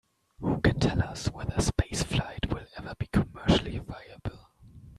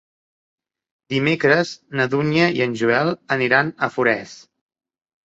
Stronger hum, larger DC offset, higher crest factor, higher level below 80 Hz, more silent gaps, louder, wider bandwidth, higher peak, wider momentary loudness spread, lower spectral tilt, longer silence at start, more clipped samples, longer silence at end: neither; neither; about the same, 20 dB vs 18 dB; first, -40 dBFS vs -60 dBFS; neither; second, -29 LUFS vs -19 LUFS; first, 13 kHz vs 8 kHz; second, -8 dBFS vs -2 dBFS; first, 14 LU vs 7 LU; about the same, -5.5 dB/octave vs -6 dB/octave; second, 0.4 s vs 1.1 s; neither; second, 0.05 s vs 0.85 s